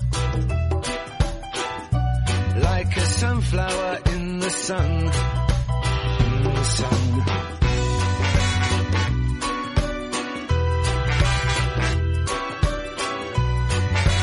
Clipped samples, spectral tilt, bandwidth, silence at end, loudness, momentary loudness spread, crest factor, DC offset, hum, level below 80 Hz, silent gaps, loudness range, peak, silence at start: under 0.1%; -5 dB/octave; 11 kHz; 0 s; -23 LUFS; 5 LU; 14 dB; under 0.1%; none; -28 dBFS; none; 1 LU; -8 dBFS; 0 s